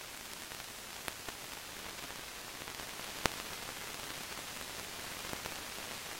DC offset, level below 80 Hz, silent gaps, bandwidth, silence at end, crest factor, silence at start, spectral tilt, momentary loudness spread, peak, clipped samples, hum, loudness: under 0.1%; -62 dBFS; none; 16.5 kHz; 0 s; 40 dB; 0 s; -1.5 dB/octave; 7 LU; -4 dBFS; under 0.1%; none; -42 LUFS